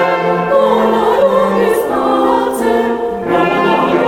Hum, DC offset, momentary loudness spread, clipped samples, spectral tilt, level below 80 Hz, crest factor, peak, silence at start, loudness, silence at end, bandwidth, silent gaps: none; under 0.1%; 3 LU; under 0.1%; -5.5 dB/octave; -44 dBFS; 12 dB; 0 dBFS; 0 s; -12 LUFS; 0 s; 17.5 kHz; none